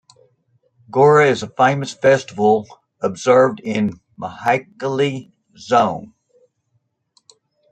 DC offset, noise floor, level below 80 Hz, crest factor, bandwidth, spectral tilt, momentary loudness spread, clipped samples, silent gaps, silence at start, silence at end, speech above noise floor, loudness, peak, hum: under 0.1%; -68 dBFS; -62 dBFS; 18 dB; 9 kHz; -5.5 dB/octave; 12 LU; under 0.1%; none; 0.95 s; 1.65 s; 51 dB; -17 LUFS; -2 dBFS; none